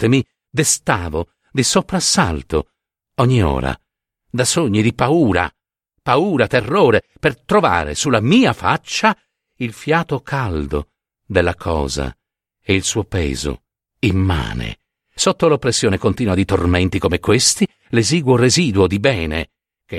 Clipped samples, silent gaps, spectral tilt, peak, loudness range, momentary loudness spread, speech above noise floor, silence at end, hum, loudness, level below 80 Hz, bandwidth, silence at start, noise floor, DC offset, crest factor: under 0.1%; none; -4.5 dB/octave; 0 dBFS; 5 LU; 12 LU; 39 dB; 0 s; none; -17 LUFS; -34 dBFS; 15.5 kHz; 0 s; -55 dBFS; under 0.1%; 18 dB